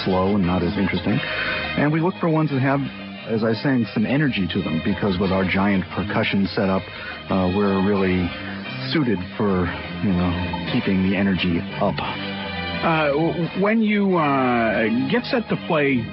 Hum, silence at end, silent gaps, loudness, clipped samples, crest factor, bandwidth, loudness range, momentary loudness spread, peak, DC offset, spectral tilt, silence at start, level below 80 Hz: none; 0 s; none; -21 LUFS; under 0.1%; 14 dB; 5.8 kHz; 2 LU; 7 LU; -8 dBFS; under 0.1%; -11.5 dB/octave; 0 s; -42 dBFS